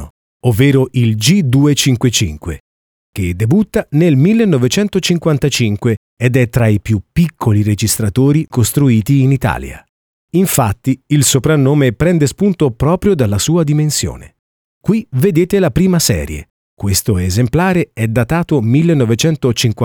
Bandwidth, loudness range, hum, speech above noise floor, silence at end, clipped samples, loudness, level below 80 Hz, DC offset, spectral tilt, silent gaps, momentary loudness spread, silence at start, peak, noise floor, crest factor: over 20 kHz; 2 LU; none; over 78 dB; 0 s; under 0.1%; -13 LUFS; -36 dBFS; under 0.1%; -5.5 dB/octave; 0.10-0.40 s, 2.60-3.13 s, 5.97-6.17 s, 9.89-10.28 s, 14.39-14.81 s, 16.50-16.77 s; 7 LU; 0 s; 0 dBFS; under -90 dBFS; 12 dB